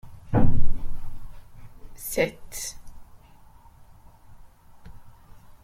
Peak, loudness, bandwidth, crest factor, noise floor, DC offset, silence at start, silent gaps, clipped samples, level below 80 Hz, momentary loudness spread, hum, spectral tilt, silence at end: -6 dBFS; -29 LUFS; 15 kHz; 18 dB; -50 dBFS; under 0.1%; 0.05 s; none; under 0.1%; -32 dBFS; 27 LU; none; -5.5 dB/octave; 2.6 s